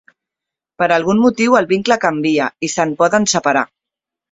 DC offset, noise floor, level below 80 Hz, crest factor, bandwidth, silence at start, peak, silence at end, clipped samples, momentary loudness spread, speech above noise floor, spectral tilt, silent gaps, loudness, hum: under 0.1%; -85 dBFS; -56 dBFS; 16 dB; 8 kHz; 0.8 s; 0 dBFS; 0.65 s; under 0.1%; 6 LU; 71 dB; -4 dB/octave; none; -15 LUFS; none